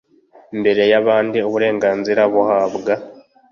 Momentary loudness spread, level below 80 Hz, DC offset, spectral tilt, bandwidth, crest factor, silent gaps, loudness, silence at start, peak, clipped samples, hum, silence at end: 8 LU; -60 dBFS; under 0.1%; -6 dB/octave; 7 kHz; 14 dB; none; -16 LUFS; 0.5 s; -2 dBFS; under 0.1%; none; 0.4 s